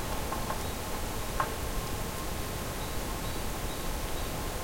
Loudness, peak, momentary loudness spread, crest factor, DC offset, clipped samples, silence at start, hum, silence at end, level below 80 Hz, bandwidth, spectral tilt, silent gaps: -35 LUFS; -16 dBFS; 3 LU; 18 dB; under 0.1%; under 0.1%; 0 s; none; 0 s; -38 dBFS; 16.5 kHz; -4 dB/octave; none